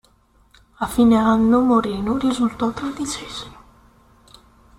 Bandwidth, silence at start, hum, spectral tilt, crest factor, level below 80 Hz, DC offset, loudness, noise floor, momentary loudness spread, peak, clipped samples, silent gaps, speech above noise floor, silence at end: 14.5 kHz; 0.8 s; none; -5.5 dB/octave; 16 dB; -46 dBFS; under 0.1%; -19 LUFS; -57 dBFS; 14 LU; -6 dBFS; under 0.1%; none; 38 dB; 1.25 s